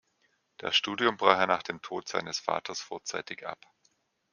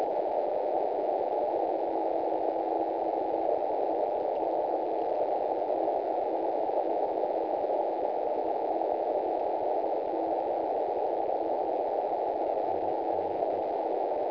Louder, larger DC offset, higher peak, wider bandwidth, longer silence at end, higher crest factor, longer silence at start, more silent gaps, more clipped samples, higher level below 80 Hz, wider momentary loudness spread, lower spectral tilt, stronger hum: about the same, -29 LUFS vs -30 LUFS; neither; first, -4 dBFS vs -14 dBFS; first, 10.5 kHz vs 5.4 kHz; first, 0.8 s vs 0 s; first, 28 dB vs 16 dB; first, 0.6 s vs 0 s; neither; neither; second, -74 dBFS vs -68 dBFS; first, 15 LU vs 1 LU; second, -2.5 dB/octave vs -8 dB/octave; neither